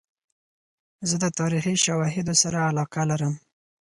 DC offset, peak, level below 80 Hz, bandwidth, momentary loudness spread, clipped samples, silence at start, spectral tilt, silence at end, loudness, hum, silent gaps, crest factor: under 0.1%; -4 dBFS; -60 dBFS; 11.5 kHz; 8 LU; under 0.1%; 1 s; -4 dB/octave; 0.5 s; -24 LUFS; none; none; 22 dB